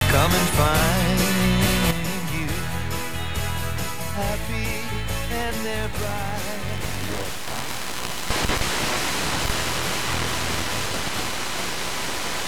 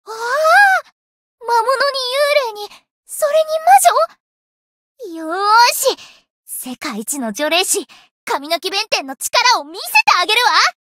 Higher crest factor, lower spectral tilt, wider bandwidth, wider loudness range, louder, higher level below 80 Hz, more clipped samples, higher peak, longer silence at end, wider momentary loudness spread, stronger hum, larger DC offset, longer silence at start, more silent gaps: about the same, 18 dB vs 16 dB; first, -3.5 dB/octave vs 0 dB/octave; first, over 20 kHz vs 16.5 kHz; about the same, 6 LU vs 4 LU; second, -24 LUFS vs -14 LUFS; first, -34 dBFS vs -72 dBFS; neither; second, -6 dBFS vs 0 dBFS; second, 0 s vs 0.15 s; second, 10 LU vs 17 LU; neither; first, 3% vs under 0.1%; about the same, 0 s vs 0.05 s; second, none vs 0.92-1.38 s, 2.91-3.03 s, 4.20-4.95 s, 6.30-6.44 s, 8.11-8.27 s